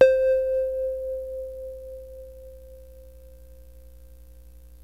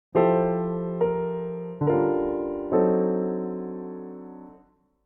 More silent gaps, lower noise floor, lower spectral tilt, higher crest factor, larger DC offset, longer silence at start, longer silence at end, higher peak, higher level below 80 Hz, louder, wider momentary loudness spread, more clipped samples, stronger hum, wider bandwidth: neither; second, -48 dBFS vs -59 dBFS; second, -5 dB/octave vs -12 dB/octave; about the same, 22 dB vs 18 dB; first, 0.2% vs under 0.1%; second, 0 s vs 0.15 s; second, 0.1 s vs 0.5 s; first, -4 dBFS vs -8 dBFS; first, -48 dBFS vs -56 dBFS; about the same, -26 LUFS vs -25 LUFS; first, 26 LU vs 17 LU; neither; first, 60 Hz at -50 dBFS vs none; first, 13.5 kHz vs 3.4 kHz